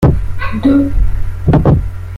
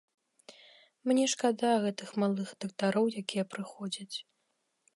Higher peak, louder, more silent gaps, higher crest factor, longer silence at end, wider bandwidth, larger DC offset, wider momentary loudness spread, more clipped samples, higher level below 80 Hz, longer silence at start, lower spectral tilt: first, -2 dBFS vs -14 dBFS; first, -14 LUFS vs -32 LUFS; neither; second, 10 dB vs 18 dB; second, 0 s vs 0.75 s; second, 10 kHz vs 11.5 kHz; neither; second, 8 LU vs 11 LU; neither; first, -18 dBFS vs -84 dBFS; second, 0 s vs 0.5 s; first, -9.5 dB/octave vs -4.5 dB/octave